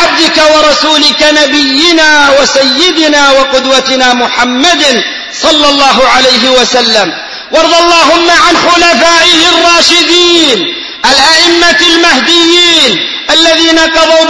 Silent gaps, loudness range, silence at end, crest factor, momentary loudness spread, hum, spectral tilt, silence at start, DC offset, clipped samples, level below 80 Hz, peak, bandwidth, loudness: none; 2 LU; 0 s; 6 dB; 5 LU; none; -1 dB/octave; 0 s; under 0.1%; 4%; -36 dBFS; 0 dBFS; 11 kHz; -4 LUFS